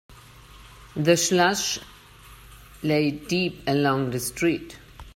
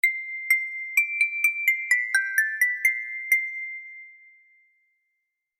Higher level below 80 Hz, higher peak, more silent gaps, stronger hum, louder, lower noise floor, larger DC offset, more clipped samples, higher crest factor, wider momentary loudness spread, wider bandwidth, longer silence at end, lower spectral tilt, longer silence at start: first, -52 dBFS vs under -90 dBFS; about the same, -6 dBFS vs -8 dBFS; neither; first, 50 Hz at -50 dBFS vs none; about the same, -24 LUFS vs -23 LUFS; second, -48 dBFS vs -79 dBFS; neither; neither; about the same, 20 dB vs 18 dB; about the same, 12 LU vs 12 LU; about the same, 16.5 kHz vs 16.5 kHz; second, 0.05 s vs 1.45 s; first, -4 dB/octave vs 7 dB/octave; about the same, 0.1 s vs 0.05 s